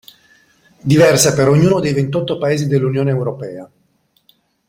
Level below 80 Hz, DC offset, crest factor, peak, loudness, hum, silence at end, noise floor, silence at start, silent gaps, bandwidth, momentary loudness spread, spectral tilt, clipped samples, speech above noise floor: -48 dBFS; under 0.1%; 16 dB; 0 dBFS; -14 LUFS; none; 1.05 s; -60 dBFS; 0.85 s; none; 16.5 kHz; 15 LU; -5.5 dB/octave; under 0.1%; 47 dB